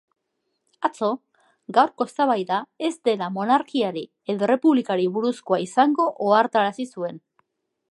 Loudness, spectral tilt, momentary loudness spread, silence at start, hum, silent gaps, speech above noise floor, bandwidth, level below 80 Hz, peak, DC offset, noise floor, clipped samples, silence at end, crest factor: -22 LUFS; -5.5 dB/octave; 10 LU; 0.8 s; none; none; 54 dB; 11.5 kHz; -78 dBFS; -4 dBFS; under 0.1%; -76 dBFS; under 0.1%; 0.7 s; 18 dB